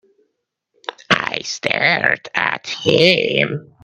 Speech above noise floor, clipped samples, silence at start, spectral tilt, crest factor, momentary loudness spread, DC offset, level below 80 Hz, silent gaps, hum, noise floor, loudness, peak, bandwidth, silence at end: 56 dB; under 0.1%; 0.9 s; -4 dB/octave; 20 dB; 11 LU; under 0.1%; -60 dBFS; none; none; -73 dBFS; -16 LUFS; 0 dBFS; 12 kHz; 0.2 s